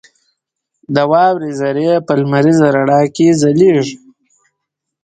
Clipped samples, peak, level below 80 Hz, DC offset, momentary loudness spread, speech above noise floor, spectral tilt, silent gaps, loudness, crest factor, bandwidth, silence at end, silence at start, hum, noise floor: under 0.1%; 0 dBFS; -56 dBFS; under 0.1%; 7 LU; 65 dB; -6.5 dB/octave; none; -12 LUFS; 14 dB; 9.4 kHz; 1.05 s; 0.9 s; none; -76 dBFS